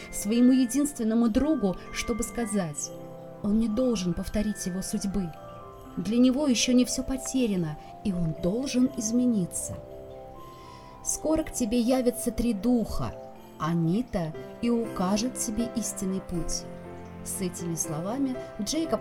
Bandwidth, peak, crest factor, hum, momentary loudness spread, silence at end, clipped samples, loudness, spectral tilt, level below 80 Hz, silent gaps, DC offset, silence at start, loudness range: 17.5 kHz; -12 dBFS; 16 dB; none; 18 LU; 0 s; under 0.1%; -28 LUFS; -5 dB/octave; -44 dBFS; none; under 0.1%; 0 s; 4 LU